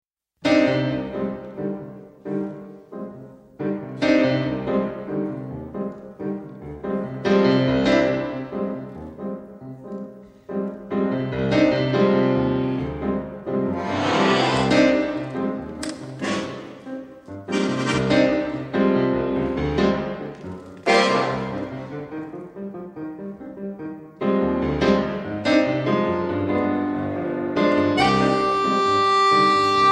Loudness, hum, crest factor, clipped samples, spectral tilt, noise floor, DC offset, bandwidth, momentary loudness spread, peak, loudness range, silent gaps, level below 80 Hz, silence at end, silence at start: -22 LUFS; none; 18 dB; under 0.1%; -6 dB/octave; -42 dBFS; under 0.1%; 11 kHz; 17 LU; -4 dBFS; 6 LU; none; -46 dBFS; 0 s; 0.4 s